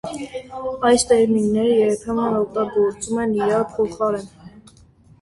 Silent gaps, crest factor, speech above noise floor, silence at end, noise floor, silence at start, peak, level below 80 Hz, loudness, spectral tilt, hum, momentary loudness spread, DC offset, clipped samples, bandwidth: none; 16 dB; 31 dB; 0.6 s; -50 dBFS; 0.05 s; -4 dBFS; -50 dBFS; -20 LUFS; -4.5 dB/octave; none; 13 LU; under 0.1%; under 0.1%; 11.5 kHz